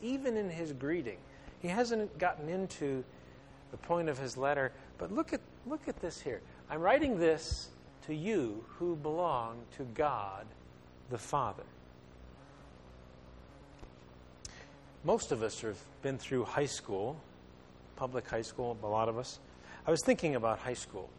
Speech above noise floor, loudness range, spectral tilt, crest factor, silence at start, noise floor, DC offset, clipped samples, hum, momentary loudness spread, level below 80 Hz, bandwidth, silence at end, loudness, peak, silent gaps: 21 dB; 9 LU; -5 dB/octave; 22 dB; 0 s; -56 dBFS; under 0.1%; under 0.1%; none; 24 LU; -58 dBFS; 12 kHz; 0 s; -36 LUFS; -14 dBFS; none